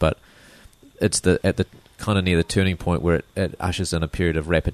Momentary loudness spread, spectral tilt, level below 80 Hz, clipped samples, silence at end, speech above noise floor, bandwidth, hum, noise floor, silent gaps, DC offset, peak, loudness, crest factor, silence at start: 8 LU; -5 dB/octave; -36 dBFS; under 0.1%; 0 s; 28 dB; 13.5 kHz; none; -50 dBFS; none; under 0.1%; -4 dBFS; -22 LUFS; 18 dB; 0 s